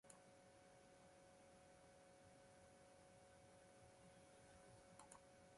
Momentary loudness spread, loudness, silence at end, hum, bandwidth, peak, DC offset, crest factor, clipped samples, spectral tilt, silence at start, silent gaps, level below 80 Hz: 3 LU; -68 LUFS; 0 s; none; 11.5 kHz; -42 dBFS; under 0.1%; 26 dB; under 0.1%; -4 dB/octave; 0.05 s; none; -84 dBFS